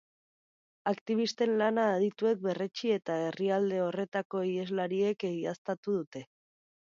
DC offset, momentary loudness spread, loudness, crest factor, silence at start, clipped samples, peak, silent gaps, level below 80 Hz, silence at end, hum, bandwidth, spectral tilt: under 0.1%; 7 LU; -32 LUFS; 16 dB; 0.85 s; under 0.1%; -16 dBFS; 1.01-1.06 s, 4.08-4.12 s, 4.25-4.30 s, 5.58-5.65 s, 5.78-5.83 s, 6.07-6.12 s; -80 dBFS; 0.6 s; none; 7.6 kHz; -6 dB/octave